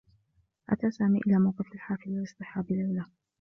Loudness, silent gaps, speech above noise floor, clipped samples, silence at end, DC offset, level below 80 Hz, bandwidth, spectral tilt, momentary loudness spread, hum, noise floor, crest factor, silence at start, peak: -30 LUFS; none; 43 dB; under 0.1%; 0.35 s; under 0.1%; -64 dBFS; 6.6 kHz; -9.5 dB/octave; 12 LU; none; -71 dBFS; 16 dB; 0.7 s; -14 dBFS